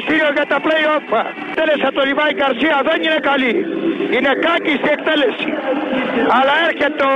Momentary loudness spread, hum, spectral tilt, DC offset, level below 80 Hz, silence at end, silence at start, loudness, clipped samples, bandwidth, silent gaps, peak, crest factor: 5 LU; none; -5 dB/octave; under 0.1%; -56 dBFS; 0 s; 0 s; -16 LUFS; under 0.1%; 9.6 kHz; none; -6 dBFS; 10 dB